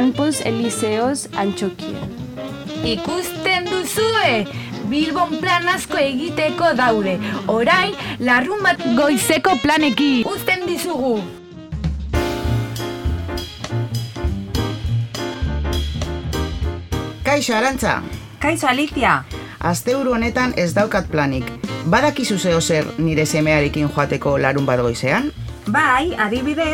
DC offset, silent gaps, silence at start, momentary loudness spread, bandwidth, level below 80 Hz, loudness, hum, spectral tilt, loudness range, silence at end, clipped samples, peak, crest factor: under 0.1%; none; 0 s; 10 LU; 19 kHz; -34 dBFS; -19 LUFS; none; -4.5 dB/octave; 7 LU; 0 s; under 0.1%; 0 dBFS; 18 dB